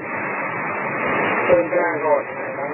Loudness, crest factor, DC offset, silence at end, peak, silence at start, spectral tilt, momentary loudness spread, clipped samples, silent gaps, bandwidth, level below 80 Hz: -20 LUFS; 18 dB; under 0.1%; 0 s; -2 dBFS; 0 s; -10.5 dB/octave; 7 LU; under 0.1%; none; 3.1 kHz; -56 dBFS